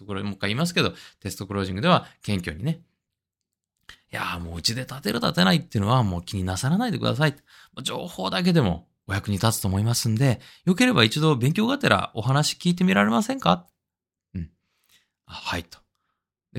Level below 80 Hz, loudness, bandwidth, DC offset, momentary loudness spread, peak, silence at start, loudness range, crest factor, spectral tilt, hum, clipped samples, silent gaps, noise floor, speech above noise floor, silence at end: -56 dBFS; -23 LUFS; 16.5 kHz; under 0.1%; 13 LU; -2 dBFS; 0 s; 7 LU; 22 dB; -5 dB/octave; none; under 0.1%; none; -88 dBFS; 64 dB; 0 s